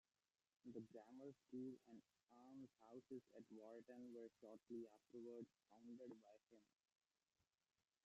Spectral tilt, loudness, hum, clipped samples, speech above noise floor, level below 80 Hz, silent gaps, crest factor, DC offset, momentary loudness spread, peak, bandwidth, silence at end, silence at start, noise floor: -7.5 dB/octave; -61 LUFS; none; under 0.1%; over 29 dB; under -90 dBFS; 2.23-2.27 s; 18 dB; under 0.1%; 8 LU; -44 dBFS; 8 kHz; 1.4 s; 0.65 s; under -90 dBFS